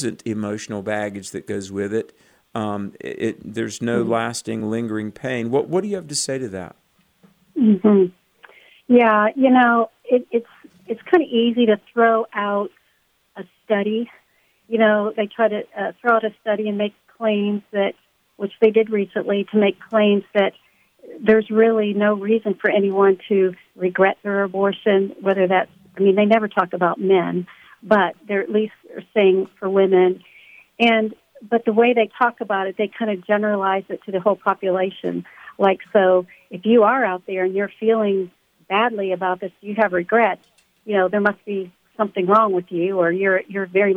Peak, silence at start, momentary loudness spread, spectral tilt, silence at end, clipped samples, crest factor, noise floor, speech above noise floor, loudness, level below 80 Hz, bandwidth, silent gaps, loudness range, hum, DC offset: -2 dBFS; 0 s; 12 LU; -5.5 dB/octave; 0 s; under 0.1%; 16 dB; -64 dBFS; 45 dB; -19 LUFS; -68 dBFS; 11.5 kHz; none; 5 LU; none; under 0.1%